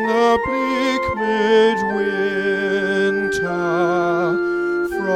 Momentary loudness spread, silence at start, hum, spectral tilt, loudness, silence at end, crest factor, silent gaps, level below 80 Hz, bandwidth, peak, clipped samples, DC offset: 5 LU; 0 s; none; -5.5 dB/octave; -18 LUFS; 0 s; 14 dB; none; -48 dBFS; 14 kHz; -4 dBFS; under 0.1%; under 0.1%